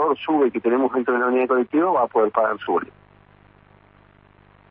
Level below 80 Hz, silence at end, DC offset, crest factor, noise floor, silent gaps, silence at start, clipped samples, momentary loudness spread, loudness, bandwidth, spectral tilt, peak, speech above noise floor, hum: -64 dBFS; 1.85 s; under 0.1%; 16 dB; -53 dBFS; none; 0 s; under 0.1%; 5 LU; -20 LUFS; 3.8 kHz; -10 dB/octave; -6 dBFS; 33 dB; 50 Hz at -60 dBFS